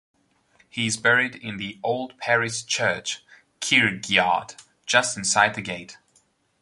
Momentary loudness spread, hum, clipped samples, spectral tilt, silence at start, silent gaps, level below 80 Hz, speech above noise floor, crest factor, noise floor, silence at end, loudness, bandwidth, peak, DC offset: 14 LU; none; under 0.1%; -2 dB/octave; 0.75 s; none; -62 dBFS; 41 dB; 22 dB; -64 dBFS; 0.7 s; -22 LUFS; 11.5 kHz; -2 dBFS; under 0.1%